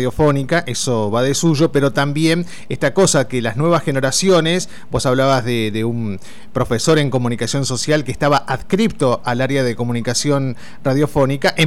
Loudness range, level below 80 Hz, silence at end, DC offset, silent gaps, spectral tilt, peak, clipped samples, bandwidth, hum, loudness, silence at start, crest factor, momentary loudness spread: 2 LU; -42 dBFS; 0 s; 4%; none; -5 dB/octave; -4 dBFS; under 0.1%; 16 kHz; none; -17 LUFS; 0 s; 12 dB; 6 LU